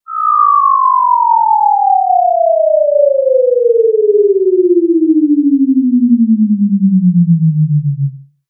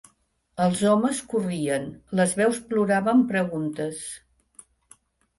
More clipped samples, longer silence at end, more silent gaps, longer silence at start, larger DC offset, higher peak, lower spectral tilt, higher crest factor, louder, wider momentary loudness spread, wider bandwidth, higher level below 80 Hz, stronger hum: neither; second, 0.25 s vs 1.2 s; neither; second, 0.1 s vs 0.55 s; neither; first, 0 dBFS vs -8 dBFS; first, -18 dB/octave vs -5.5 dB/octave; second, 10 dB vs 18 dB; first, -10 LUFS vs -24 LUFS; second, 2 LU vs 11 LU; second, 1.4 kHz vs 11.5 kHz; second, -82 dBFS vs -62 dBFS; neither